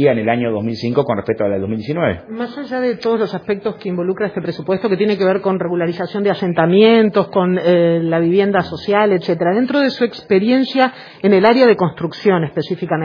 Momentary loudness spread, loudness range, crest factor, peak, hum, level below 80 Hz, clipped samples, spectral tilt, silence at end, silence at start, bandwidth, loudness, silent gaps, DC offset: 10 LU; 6 LU; 16 dB; 0 dBFS; none; -56 dBFS; under 0.1%; -8.5 dB/octave; 0 s; 0 s; 5.2 kHz; -16 LUFS; none; under 0.1%